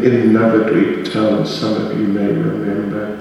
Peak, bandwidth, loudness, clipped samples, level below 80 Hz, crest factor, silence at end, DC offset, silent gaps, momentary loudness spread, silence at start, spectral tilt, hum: 0 dBFS; 12 kHz; -16 LUFS; under 0.1%; -52 dBFS; 14 dB; 0 s; under 0.1%; none; 8 LU; 0 s; -7.5 dB/octave; none